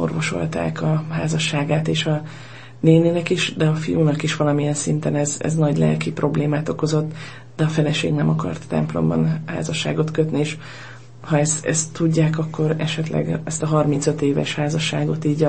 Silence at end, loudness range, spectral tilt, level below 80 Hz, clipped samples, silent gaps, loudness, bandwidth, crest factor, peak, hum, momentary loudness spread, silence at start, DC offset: 0 s; 2 LU; -5.5 dB/octave; -52 dBFS; under 0.1%; none; -20 LUFS; 8.8 kHz; 18 dB; -2 dBFS; none; 6 LU; 0 s; 0.6%